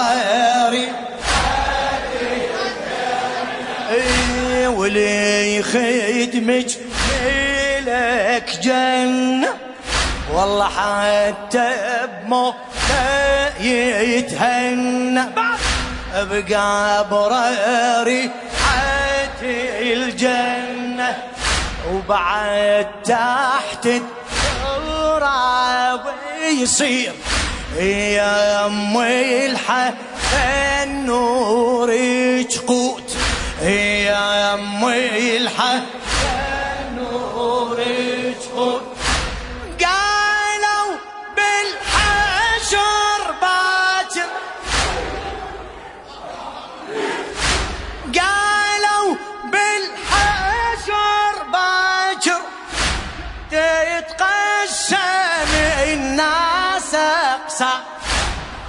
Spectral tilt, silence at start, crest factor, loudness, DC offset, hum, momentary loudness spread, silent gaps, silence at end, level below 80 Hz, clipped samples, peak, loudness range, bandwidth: -3 dB/octave; 0 s; 16 dB; -18 LUFS; under 0.1%; none; 8 LU; none; 0 s; -34 dBFS; under 0.1%; -2 dBFS; 3 LU; 11 kHz